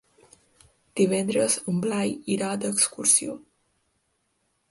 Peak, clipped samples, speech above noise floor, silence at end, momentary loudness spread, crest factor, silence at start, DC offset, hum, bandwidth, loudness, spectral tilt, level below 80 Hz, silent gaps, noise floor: -6 dBFS; under 0.1%; 48 dB; 1.35 s; 11 LU; 20 dB; 0.95 s; under 0.1%; none; 12 kHz; -23 LUFS; -3.5 dB/octave; -68 dBFS; none; -73 dBFS